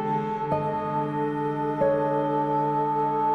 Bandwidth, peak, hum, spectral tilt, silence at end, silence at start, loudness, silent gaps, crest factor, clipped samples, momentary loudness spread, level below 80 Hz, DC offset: 9.2 kHz; -10 dBFS; none; -9 dB/octave; 0 s; 0 s; -26 LUFS; none; 14 dB; under 0.1%; 4 LU; -58 dBFS; under 0.1%